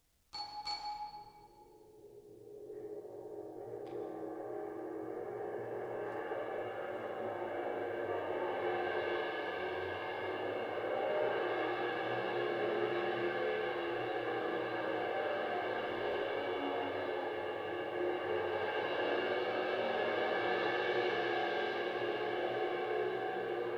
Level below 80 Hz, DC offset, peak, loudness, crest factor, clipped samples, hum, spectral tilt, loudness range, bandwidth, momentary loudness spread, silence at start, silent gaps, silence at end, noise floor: -76 dBFS; under 0.1%; -22 dBFS; -38 LUFS; 16 dB; under 0.1%; none; -5.5 dB/octave; 11 LU; 12 kHz; 11 LU; 0.35 s; none; 0 s; -60 dBFS